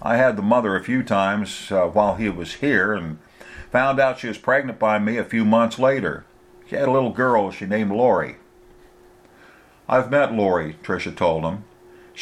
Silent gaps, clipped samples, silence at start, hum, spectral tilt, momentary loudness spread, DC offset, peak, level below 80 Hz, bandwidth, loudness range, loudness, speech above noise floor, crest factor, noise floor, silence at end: none; under 0.1%; 0 s; none; -6.5 dB/octave; 10 LU; under 0.1%; -4 dBFS; -52 dBFS; 12.5 kHz; 3 LU; -21 LUFS; 30 dB; 18 dB; -50 dBFS; 0 s